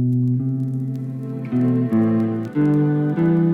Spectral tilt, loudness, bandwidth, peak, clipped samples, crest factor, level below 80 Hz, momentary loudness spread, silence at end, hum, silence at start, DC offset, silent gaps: -11 dB/octave; -20 LUFS; 4.1 kHz; -8 dBFS; under 0.1%; 10 dB; -58 dBFS; 9 LU; 0 s; none; 0 s; under 0.1%; none